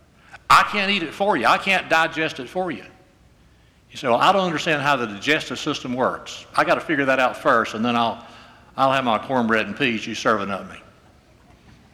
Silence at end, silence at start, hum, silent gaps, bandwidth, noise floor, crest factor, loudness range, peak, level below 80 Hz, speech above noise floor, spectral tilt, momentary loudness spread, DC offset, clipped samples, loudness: 1.15 s; 0.35 s; none; none; over 20 kHz; -54 dBFS; 16 dB; 3 LU; -4 dBFS; -56 dBFS; 33 dB; -4 dB/octave; 12 LU; under 0.1%; under 0.1%; -20 LUFS